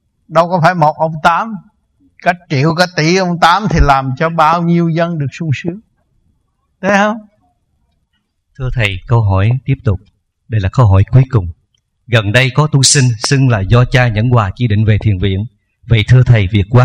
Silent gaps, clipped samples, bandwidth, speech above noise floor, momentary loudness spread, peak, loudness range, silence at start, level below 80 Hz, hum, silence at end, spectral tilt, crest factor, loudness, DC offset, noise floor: none; 0.3%; 11.5 kHz; 53 dB; 10 LU; 0 dBFS; 7 LU; 0.3 s; -28 dBFS; none; 0 s; -5.5 dB/octave; 12 dB; -12 LUFS; under 0.1%; -64 dBFS